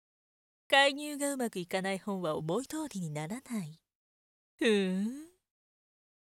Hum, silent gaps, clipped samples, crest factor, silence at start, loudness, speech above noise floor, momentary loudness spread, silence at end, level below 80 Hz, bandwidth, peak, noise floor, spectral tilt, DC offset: none; 3.95-4.58 s; under 0.1%; 24 dB; 0.7 s; -32 LUFS; over 58 dB; 14 LU; 1.05 s; -76 dBFS; 17.5 kHz; -10 dBFS; under -90 dBFS; -4 dB/octave; under 0.1%